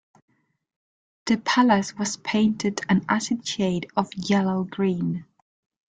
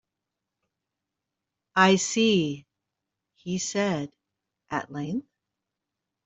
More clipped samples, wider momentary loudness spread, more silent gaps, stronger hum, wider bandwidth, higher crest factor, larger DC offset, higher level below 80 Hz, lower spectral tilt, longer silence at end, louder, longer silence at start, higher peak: neither; second, 8 LU vs 15 LU; neither; neither; first, 9.4 kHz vs 8.2 kHz; second, 18 dB vs 24 dB; neither; first, -62 dBFS vs -70 dBFS; about the same, -5 dB/octave vs -4 dB/octave; second, 0.65 s vs 1.05 s; about the same, -24 LUFS vs -25 LUFS; second, 1.25 s vs 1.75 s; about the same, -6 dBFS vs -4 dBFS